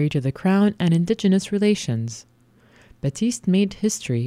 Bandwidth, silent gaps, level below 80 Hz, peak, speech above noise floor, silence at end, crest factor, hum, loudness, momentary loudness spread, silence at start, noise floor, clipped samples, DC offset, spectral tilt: 14.5 kHz; none; -54 dBFS; -8 dBFS; 34 dB; 0 s; 14 dB; none; -21 LUFS; 10 LU; 0 s; -55 dBFS; under 0.1%; under 0.1%; -6 dB/octave